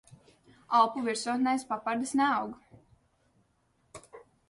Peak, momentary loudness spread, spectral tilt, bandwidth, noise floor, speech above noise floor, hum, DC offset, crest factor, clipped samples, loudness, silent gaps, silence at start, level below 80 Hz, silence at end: -12 dBFS; 22 LU; -3.5 dB/octave; 11.5 kHz; -71 dBFS; 43 dB; none; under 0.1%; 20 dB; under 0.1%; -29 LUFS; none; 0.1 s; -72 dBFS; 0.3 s